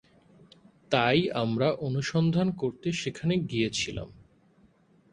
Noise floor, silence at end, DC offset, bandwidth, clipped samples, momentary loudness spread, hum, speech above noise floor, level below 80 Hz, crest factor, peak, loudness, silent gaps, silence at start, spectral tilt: -62 dBFS; 1 s; under 0.1%; 10 kHz; under 0.1%; 7 LU; none; 35 dB; -58 dBFS; 22 dB; -8 dBFS; -28 LUFS; none; 0.9 s; -5.5 dB/octave